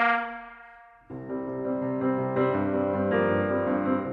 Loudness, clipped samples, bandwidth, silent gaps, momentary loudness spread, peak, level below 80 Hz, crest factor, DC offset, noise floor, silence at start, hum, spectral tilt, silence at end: -27 LUFS; under 0.1%; 5.2 kHz; none; 17 LU; -12 dBFS; -62 dBFS; 16 dB; under 0.1%; -51 dBFS; 0 s; none; -9.5 dB/octave; 0 s